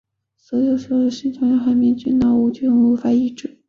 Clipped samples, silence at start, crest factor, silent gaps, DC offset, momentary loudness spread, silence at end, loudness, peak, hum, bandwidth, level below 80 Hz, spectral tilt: under 0.1%; 0.5 s; 10 dB; none; under 0.1%; 6 LU; 0.2 s; -18 LUFS; -8 dBFS; none; 7 kHz; -52 dBFS; -7 dB/octave